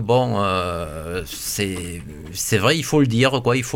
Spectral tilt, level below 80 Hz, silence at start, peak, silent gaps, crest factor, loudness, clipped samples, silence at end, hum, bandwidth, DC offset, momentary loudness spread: -4.5 dB/octave; -42 dBFS; 0 s; -4 dBFS; none; 16 dB; -20 LUFS; under 0.1%; 0 s; none; 17 kHz; under 0.1%; 12 LU